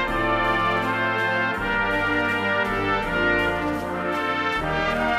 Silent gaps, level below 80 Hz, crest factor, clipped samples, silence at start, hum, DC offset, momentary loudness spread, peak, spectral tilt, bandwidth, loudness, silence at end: none; -40 dBFS; 14 dB; under 0.1%; 0 s; none; under 0.1%; 3 LU; -8 dBFS; -5.5 dB/octave; 15.5 kHz; -22 LUFS; 0 s